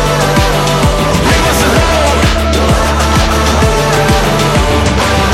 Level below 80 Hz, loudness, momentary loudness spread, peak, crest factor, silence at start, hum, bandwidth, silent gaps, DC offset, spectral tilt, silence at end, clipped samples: -16 dBFS; -10 LUFS; 1 LU; 0 dBFS; 10 dB; 0 s; none; 16.5 kHz; none; under 0.1%; -4.5 dB/octave; 0 s; under 0.1%